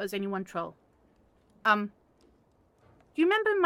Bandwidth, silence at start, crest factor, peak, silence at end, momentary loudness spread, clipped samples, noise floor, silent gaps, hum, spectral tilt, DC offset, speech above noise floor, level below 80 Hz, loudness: 16 kHz; 0 s; 20 dB; -10 dBFS; 0 s; 15 LU; under 0.1%; -66 dBFS; none; none; -5.5 dB/octave; under 0.1%; 38 dB; -72 dBFS; -29 LUFS